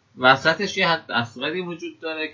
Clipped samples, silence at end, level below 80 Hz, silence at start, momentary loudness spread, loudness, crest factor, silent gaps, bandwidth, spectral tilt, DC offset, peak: under 0.1%; 0 s; -62 dBFS; 0.15 s; 14 LU; -21 LUFS; 22 dB; none; 7.6 kHz; -4 dB/octave; under 0.1%; -2 dBFS